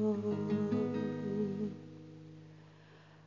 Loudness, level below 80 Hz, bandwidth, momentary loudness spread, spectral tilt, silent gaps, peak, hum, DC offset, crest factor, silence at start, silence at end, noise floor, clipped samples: -36 LUFS; -74 dBFS; 7.4 kHz; 20 LU; -9 dB/octave; none; -22 dBFS; none; under 0.1%; 14 dB; 0 s; 0.05 s; -58 dBFS; under 0.1%